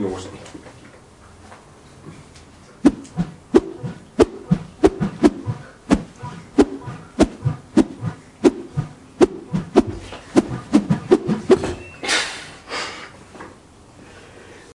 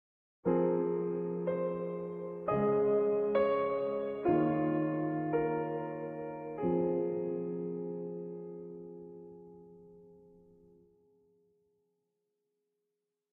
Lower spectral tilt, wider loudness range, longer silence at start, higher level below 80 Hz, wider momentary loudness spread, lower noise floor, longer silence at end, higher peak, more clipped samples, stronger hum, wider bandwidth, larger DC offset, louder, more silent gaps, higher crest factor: second, -6 dB/octave vs -11 dB/octave; second, 5 LU vs 16 LU; second, 0 s vs 0.45 s; first, -42 dBFS vs -68 dBFS; first, 21 LU vs 16 LU; second, -46 dBFS vs -87 dBFS; second, 0.25 s vs 3.15 s; first, 0 dBFS vs -18 dBFS; neither; neither; first, 11.5 kHz vs 4.2 kHz; neither; first, -20 LUFS vs -33 LUFS; neither; first, 22 dB vs 16 dB